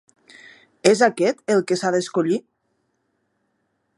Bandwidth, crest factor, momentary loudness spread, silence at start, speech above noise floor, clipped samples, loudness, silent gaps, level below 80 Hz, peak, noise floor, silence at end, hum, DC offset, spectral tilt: 11.5 kHz; 22 dB; 6 LU; 0.85 s; 52 dB; under 0.1%; -20 LUFS; none; -72 dBFS; 0 dBFS; -71 dBFS; 1.55 s; none; under 0.1%; -4.5 dB/octave